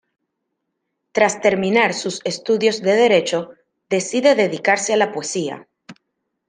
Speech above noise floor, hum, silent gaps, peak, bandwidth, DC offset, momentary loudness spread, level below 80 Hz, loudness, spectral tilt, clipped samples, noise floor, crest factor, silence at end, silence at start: 58 dB; none; none; -2 dBFS; 10 kHz; under 0.1%; 10 LU; -68 dBFS; -18 LUFS; -3.5 dB/octave; under 0.1%; -76 dBFS; 18 dB; 0.55 s; 1.15 s